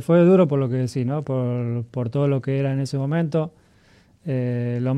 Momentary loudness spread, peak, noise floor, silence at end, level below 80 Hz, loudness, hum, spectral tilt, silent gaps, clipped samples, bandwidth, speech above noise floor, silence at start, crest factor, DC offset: 11 LU; -6 dBFS; -55 dBFS; 0 s; -62 dBFS; -22 LUFS; none; -9 dB/octave; none; under 0.1%; 11 kHz; 34 dB; 0 s; 14 dB; under 0.1%